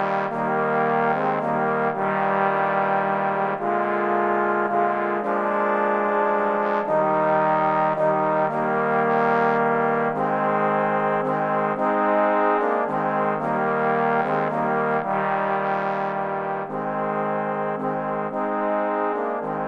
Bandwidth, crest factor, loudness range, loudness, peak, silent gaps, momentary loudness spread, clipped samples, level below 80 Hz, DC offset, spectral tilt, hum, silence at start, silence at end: 7 kHz; 14 dB; 4 LU; -22 LUFS; -8 dBFS; none; 5 LU; under 0.1%; -68 dBFS; under 0.1%; -8 dB/octave; none; 0 s; 0 s